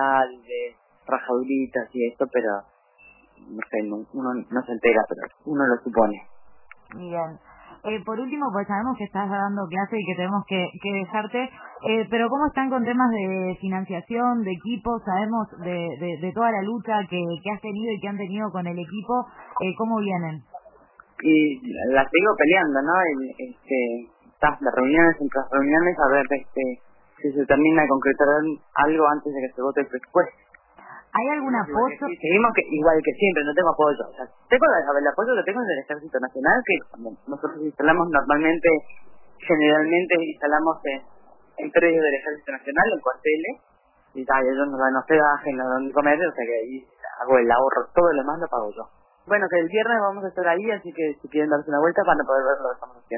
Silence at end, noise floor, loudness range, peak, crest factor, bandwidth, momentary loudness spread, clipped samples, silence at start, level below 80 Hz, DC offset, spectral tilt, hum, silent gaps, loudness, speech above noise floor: 0 s; -54 dBFS; 6 LU; -4 dBFS; 18 dB; 3.1 kHz; 12 LU; under 0.1%; 0 s; -54 dBFS; under 0.1%; -10 dB/octave; none; none; -23 LUFS; 32 dB